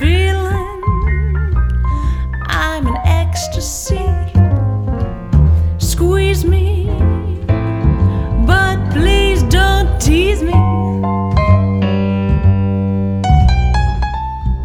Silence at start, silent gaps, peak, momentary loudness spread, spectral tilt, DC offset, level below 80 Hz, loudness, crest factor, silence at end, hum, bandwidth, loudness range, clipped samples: 0 s; none; 0 dBFS; 7 LU; -6 dB/octave; under 0.1%; -16 dBFS; -15 LUFS; 12 dB; 0 s; none; 16 kHz; 3 LU; under 0.1%